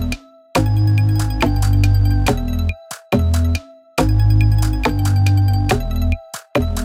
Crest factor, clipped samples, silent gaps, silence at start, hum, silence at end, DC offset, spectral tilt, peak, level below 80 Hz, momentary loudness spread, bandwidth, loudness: 14 dB; under 0.1%; none; 0 s; none; 0 s; under 0.1%; -6.5 dB/octave; -2 dBFS; -22 dBFS; 9 LU; 16 kHz; -17 LUFS